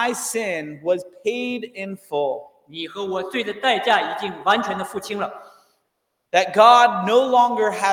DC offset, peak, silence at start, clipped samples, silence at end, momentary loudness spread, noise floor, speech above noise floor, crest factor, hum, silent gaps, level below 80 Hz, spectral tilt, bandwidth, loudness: under 0.1%; 0 dBFS; 0 s; under 0.1%; 0 s; 15 LU; -74 dBFS; 54 dB; 20 dB; none; none; -72 dBFS; -3 dB/octave; 18 kHz; -20 LUFS